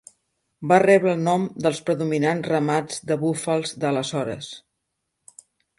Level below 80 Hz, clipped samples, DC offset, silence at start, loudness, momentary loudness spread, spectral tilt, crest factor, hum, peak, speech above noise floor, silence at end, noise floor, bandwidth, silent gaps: -66 dBFS; under 0.1%; under 0.1%; 0.6 s; -22 LUFS; 12 LU; -5.5 dB/octave; 20 dB; none; -4 dBFS; 57 dB; 1.2 s; -78 dBFS; 11.5 kHz; none